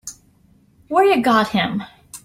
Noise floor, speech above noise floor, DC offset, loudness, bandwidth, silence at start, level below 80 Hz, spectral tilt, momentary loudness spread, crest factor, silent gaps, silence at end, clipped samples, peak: -55 dBFS; 38 dB; under 0.1%; -17 LUFS; 15.5 kHz; 0.05 s; -56 dBFS; -4.5 dB/octave; 19 LU; 16 dB; none; 0.05 s; under 0.1%; -4 dBFS